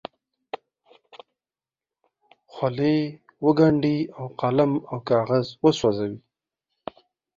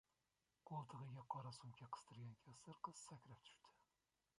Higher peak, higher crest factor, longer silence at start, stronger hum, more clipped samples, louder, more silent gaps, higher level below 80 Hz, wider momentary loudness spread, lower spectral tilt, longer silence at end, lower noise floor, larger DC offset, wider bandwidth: first, -4 dBFS vs -34 dBFS; about the same, 22 dB vs 24 dB; first, 1.15 s vs 0.65 s; neither; neither; first, -23 LUFS vs -57 LUFS; neither; first, -62 dBFS vs -88 dBFS; first, 22 LU vs 11 LU; first, -7.5 dB/octave vs -5 dB/octave; first, 1.2 s vs 0.6 s; about the same, under -90 dBFS vs under -90 dBFS; neither; second, 7.6 kHz vs 11.5 kHz